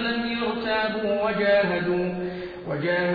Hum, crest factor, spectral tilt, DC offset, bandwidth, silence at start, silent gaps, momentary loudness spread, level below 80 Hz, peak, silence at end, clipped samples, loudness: none; 12 dB; -8.5 dB/octave; under 0.1%; 5.2 kHz; 0 s; none; 10 LU; -54 dBFS; -12 dBFS; 0 s; under 0.1%; -25 LUFS